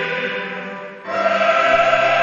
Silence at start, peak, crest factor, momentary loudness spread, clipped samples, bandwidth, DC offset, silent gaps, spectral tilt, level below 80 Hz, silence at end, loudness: 0 s; -2 dBFS; 16 dB; 15 LU; under 0.1%; 7.4 kHz; under 0.1%; none; -1 dB/octave; -54 dBFS; 0 s; -17 LUFS